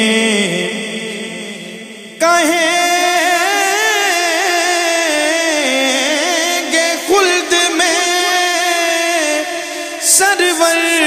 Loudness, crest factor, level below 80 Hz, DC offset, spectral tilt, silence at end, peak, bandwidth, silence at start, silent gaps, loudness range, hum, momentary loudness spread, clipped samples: -13 LUFS; 14 dB; -62 dBFS; under 0.1%; -1 dB/octave; 0 s; 0 dBFS; 15.5 kHz; 0 s; none; 2 LU; none; 10 LU; under 0.1%